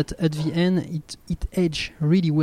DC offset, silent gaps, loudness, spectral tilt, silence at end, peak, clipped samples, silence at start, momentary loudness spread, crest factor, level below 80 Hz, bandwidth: under 0.1%; none; -24 LUFS; -6.5 dB/octave; 0 s; -8 dBFS; under 0.1%; 0 s; 11 LU; 14 dB; -38 dBFS; 14 kHz